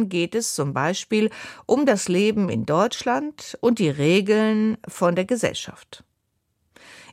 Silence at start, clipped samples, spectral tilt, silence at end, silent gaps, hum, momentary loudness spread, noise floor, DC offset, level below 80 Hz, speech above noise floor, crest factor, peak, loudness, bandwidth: 0 s; under 0.1%; -5 dB/octave; 0.1 s; none; none; 7 LU; -73 dBFS; under 0.1%; -62 dBFS; 51 dB; 18 dB; -4 dBFS; -22 LUFS; 15 kHz